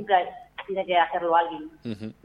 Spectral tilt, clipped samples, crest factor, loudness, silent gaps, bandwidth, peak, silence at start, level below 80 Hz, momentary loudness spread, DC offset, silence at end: -6.5 dB/octave; under 0.1%; 20 dB; -25 LUFS; none; 5.4 kHz; -6 dBFS; 0 s; -64 dBFS; 14 LU; under 0.1%; 0.1 s